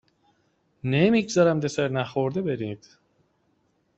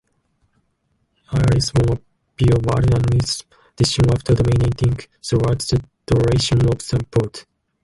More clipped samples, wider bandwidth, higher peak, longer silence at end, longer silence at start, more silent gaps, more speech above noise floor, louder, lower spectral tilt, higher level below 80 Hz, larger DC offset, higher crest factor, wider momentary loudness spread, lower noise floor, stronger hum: neither; second, 8.2 kHz vs 11.5 kHz; second, -8 dBFS vs -4 dBFS; first, 1.2 s vs 0.4 s; second, 0.85 s vs 1.3 s; neither; second, 45 dB vs 50 dB; second, -24 LUFS vs -19 LUFS; about the same, -6 dB/octave vs -6 dB/octave; second, -62 dBFS vs -32 dBFS; neither; about the same, 18 dB vs 14 dB; first, 13 LU vs 8 LU; about the same, -69 dBFS vs -67 dBFS; neither